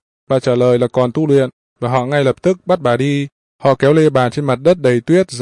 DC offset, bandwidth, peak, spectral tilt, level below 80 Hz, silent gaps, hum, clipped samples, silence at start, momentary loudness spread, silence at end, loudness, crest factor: under 0.1%; 11.5 kHz; -2 dBFS; -7 dB/octave; -54 dBFS; 1.53-1.76 s, 3.32-3.59 s; none; under 0.1%; 0.3 s; 7 LU; 0 s; -15 LUFS; 12 dB